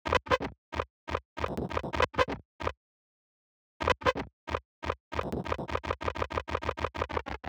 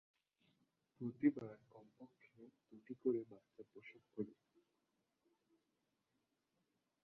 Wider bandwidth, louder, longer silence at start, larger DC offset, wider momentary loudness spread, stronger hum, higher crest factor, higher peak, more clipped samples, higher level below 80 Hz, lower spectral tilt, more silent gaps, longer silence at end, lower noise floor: first, over 20 kHz vs 4.4 kHz; first, -33 LUFS vs -44 LUFS; second, 0.05 s vs 1 s; neither; second, 10 LU vs 26 LU; neither; about the same, 24 dB vs 26 dB; first, -10 dBFS vs -24 dBFS; neither; first, -46 dBFS vs under -90 dBFS; second, -5.5 dB/octave vs -8.5 dB/octave; first, 0.58-0.72 s, 0.90-1.07 s, 1.25-1.36 s, 2.45-2.59 s, 2.77-3.80 s, 4.33-4.47 s, 4.65-4.82 s, 5.00-5.11 s vs none; second, 0 s vs 2.7 s; about the same, under -90 dBFS vs -87 dBFS